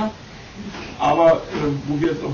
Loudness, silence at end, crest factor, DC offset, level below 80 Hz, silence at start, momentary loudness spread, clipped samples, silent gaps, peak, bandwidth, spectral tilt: -19 LUFS; 0 s; 16 dB; under 0.1%; -46 dBFS; 0 s; 20 LU; under 0.1%; none; -4 dBFS; 7.4 kHz; -6.5 dB/octave